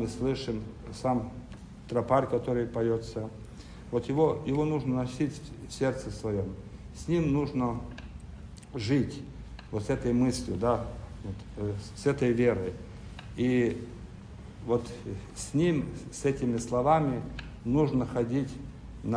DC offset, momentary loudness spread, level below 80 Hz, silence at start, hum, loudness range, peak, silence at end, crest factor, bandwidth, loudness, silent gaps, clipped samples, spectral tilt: under 0.1%; 18 LU; -48 dBFS; 0 s; none; 3 LU; -12 dBFS; 0 s; 20 dB; 10.5 kHz; -30 LUFS; none; under 0.1%; -7 dB/octave